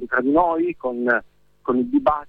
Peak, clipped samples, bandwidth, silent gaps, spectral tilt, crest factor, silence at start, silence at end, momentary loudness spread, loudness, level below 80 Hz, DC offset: -6 dBFS; under 0.1%; 4.8 kHz; none; -8.5 dB/octave; 16 dB; 0 s; 0 s; 6 LU; -21 LUFS; -50 dBFS; under 0.1%